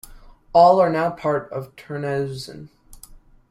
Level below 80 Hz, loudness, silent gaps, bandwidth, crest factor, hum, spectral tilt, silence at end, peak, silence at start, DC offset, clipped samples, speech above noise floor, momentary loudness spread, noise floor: -50 dBFS; -19 LUFS; none; 15.5 kHz; 20 dB; none; -6.5 dB/octave; 0.55 s; -2 dBFS; 0.1 s; under 0.1%; under 0.1%; 27 dB; 19 LU; -46 dBFS